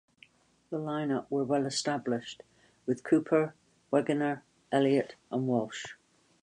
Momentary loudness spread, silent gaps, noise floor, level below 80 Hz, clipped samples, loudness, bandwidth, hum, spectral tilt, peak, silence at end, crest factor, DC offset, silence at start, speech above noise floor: 14 LU; none; -62 dBFS; -76 dBFS; under 0.1%; -31 LUFS; 11 kHz; none; -5.5 dB/octave; -12 dBFS; 0.5 s; 20 dB; under 0.1%; 0.7 s; 32 dB